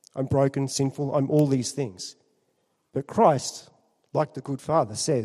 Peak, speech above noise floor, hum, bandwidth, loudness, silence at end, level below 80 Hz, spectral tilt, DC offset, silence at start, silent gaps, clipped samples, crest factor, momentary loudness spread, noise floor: -6 dBFS; 47 dB; none; 13 kHz; -25 LUFS; 0 s; -62 dBFS; -6 dB/octave; under 0.1%; 0.15 s; none; under 0.1%; 20 dB; 13 LU; -72 dBFS